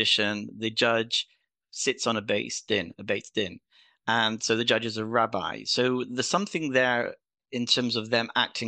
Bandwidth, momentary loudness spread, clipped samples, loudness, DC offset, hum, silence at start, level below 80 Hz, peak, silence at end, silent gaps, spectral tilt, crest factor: 10 kHz; 8 LU; under 0.1%; -26 LUFS; under 0.1%; none; 0 s; -72 dBFS; -8 dBFS; 0 s; none; -3 dB/octave; 20 dB